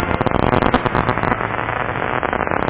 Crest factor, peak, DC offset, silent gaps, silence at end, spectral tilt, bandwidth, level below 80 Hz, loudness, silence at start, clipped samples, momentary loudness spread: 18 dB; 0 dBFS; under 0.1%; none; 0 s; -10 dB/octave; 4 kHz; -32 dBFS; -18 LUFS; 0 s; 0.4%; 5 LU